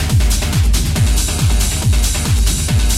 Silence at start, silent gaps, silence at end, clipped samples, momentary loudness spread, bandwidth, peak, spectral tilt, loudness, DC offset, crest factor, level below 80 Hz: 0 s; none; 0 s; under 0.1%; 1 LU; 16 kHz; -2 dBFS; -4 dB/octave; -15 LUFS; under 0.1%; 10 dB; -16 dBFS